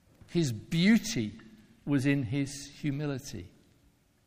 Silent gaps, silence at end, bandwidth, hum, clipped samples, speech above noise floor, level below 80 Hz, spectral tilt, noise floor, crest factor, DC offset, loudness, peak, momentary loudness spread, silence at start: none; 0.8 s; 15.5 kHz; none; under 0.1%; 36 dB; -58 dBFS; -5.5 dB/octave; -66 dBFS; 18 dB; under 0.1%; -30 LUFS; -14 dBFS; 14 LU; 0.3 s